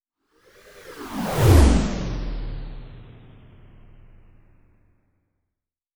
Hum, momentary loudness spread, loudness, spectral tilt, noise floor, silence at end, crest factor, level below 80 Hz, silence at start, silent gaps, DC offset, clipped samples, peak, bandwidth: none; 27 LU; -21 LUFS; -6.5 dB/octave; -84 dBFS; 2.9 s; 22 dB; -28 dBFS; 0.85 s; none; under 0.1%; under 0.1%; -2 dBFS; over 20 kHz